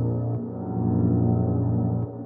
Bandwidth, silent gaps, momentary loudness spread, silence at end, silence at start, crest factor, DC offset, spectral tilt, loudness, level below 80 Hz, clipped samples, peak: 1.9 kHz; none; 8 LU; 0 s; 0 s; 12 dB; under 0.1%; -15.5 dB/octave; -25 LUFS; -46 dBFS; under 0.1%; -10 dBFS